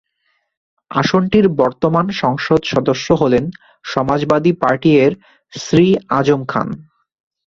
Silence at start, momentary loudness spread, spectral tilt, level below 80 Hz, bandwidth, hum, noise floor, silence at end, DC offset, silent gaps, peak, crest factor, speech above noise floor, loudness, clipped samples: 0.9 s; 13 LU; -6.5 dB/octave; -46 dBFS; 7.6 kHz; none; -66 dBFS; 0.65 s; under 0.1%; none; 0 dBFS; 14 dB; 51 dB; -15 LUFS; under 0.1%